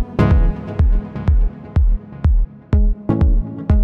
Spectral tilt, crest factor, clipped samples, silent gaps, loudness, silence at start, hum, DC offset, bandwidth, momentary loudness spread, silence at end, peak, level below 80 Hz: -10 dB/octave; 12 dB; under 0.1%; none; -19 LUFS; 0 s; none; under 0.1%; 4.4 kHz; 5 LU; 0 s; -2 dBFS; -16 dBFS